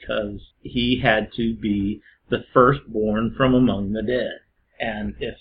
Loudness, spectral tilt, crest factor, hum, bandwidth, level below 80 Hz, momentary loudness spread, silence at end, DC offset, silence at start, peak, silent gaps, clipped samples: -22 LUFS; -10.5 dB/octave; 22 dB; none; 5.2 kHz; -42 dBFS; 13 LU; 0.05 s; under 0.1%; 0 s; 0 dBFS; none; under 0.1%